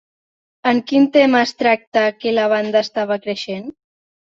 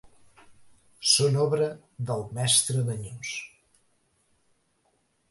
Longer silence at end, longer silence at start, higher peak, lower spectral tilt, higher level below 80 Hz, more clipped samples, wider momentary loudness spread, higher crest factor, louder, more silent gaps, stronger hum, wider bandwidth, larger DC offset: second, 0.6 s vs 1.85 s; first, 0.65 s vs 0.05 s; first, -2 dBFS vs -6 dBFS; first, -5 dB/octave vs -3 dB/octave; about the same, -66 dBFS vs -64 dBFS; neither; second, 12 LU vs 15 LU; second, 16 dB vs 22 dB; first, -17 LUFS vs -25 LUFS; first, 1.87-1.92 s vs none; neither; second, 7.6 kHz vs 12 kHz; neither